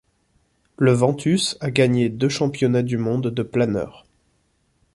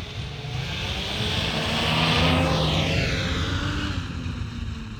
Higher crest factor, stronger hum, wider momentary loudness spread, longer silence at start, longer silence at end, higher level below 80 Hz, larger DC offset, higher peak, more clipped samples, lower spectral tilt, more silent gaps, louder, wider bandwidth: about the same, 18 dB vs 18 dB; neither; second, 6 LU vs 12 LU; first, 0.8 s vs 0 s; first, 1.05 s vs 0 s; second, -54 dBFS vs -34 dBFS; neither; first, -4 dBFS vs -8 dBFS; neither; about the same, -6 dB/octave vs -5 dB/octave; neither; first, -20 LUFS vs -24 LUFS; second, 11.5 kHz vs 18.5 kHz